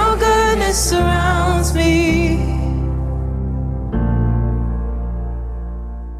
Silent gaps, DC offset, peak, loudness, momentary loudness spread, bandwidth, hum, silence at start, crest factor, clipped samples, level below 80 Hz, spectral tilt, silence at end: none; under 0.1%; -4 dBFS; -18 LUFS; 12 LU; 15.5 kHz; none; 0 s; 12 dB; under 0.1%; -22 dBFS; -5 dB/octave; 0 s